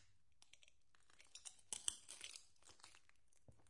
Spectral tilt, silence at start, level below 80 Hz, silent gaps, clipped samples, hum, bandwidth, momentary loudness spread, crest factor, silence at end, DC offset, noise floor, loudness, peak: 1 dB/octave; 0 s; -84 dBFS; none; under 0.1%; none; 12 kHz; 22 LU; 38 dB; 0 s; under 0.1%; -78 dBFS; -51 LUFS; -20 dBFS